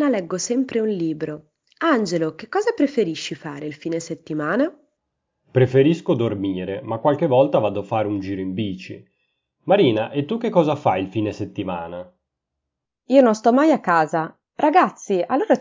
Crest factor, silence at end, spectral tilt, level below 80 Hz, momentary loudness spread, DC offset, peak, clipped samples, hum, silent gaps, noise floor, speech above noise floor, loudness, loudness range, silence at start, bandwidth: 20 dB; 0 s; -6 dB/octave; -56 dBFS; 13 LU; under 0.1%; -2 dBFS; under 0.1%; none; none; -82 dBFS; 62 dB; -21 LUFS; 4 LU; 0 s; 7.6 kHz